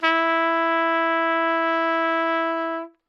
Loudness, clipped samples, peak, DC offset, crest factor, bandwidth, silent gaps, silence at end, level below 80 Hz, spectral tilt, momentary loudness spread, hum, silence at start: -21 LUFS; under 0.1%; -6 dBFS; under 0.1%; 16 dB; 6.6 kHz; none; 0.2 s; -86 dBFS; -2.5 dB/octave; 4 LU; none; 0 s